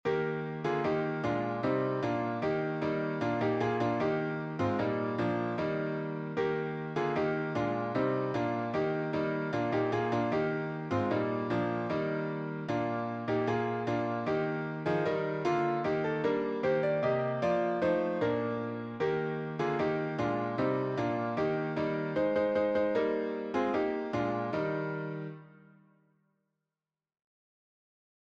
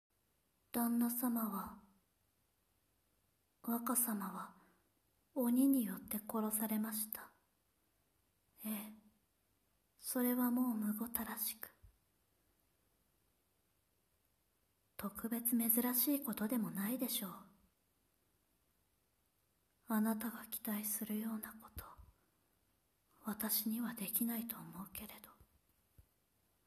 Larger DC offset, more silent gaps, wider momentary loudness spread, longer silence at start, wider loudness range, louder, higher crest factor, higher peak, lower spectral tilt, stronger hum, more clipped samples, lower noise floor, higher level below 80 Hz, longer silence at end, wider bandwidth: neither; neither; second, 5 LU vs 16 LU; second, 0.05 s vs 0.75 s; second, 2 LU vs 8 LU; first, -32 LUFS vs -39 LUFS; second, 14 dB vs 22 dB; about the same, -18 dBFS vs -20 dBFS; first, -8 dB/octave vs -4 dB/octave; neither; neither; first, under -90 dBFS vs -80 dBFS; first, -66 dBFS vs -74 dBFS; first, 2.8 s vs 0.65 s; second, 7.8 kHz vs 14.5 kHz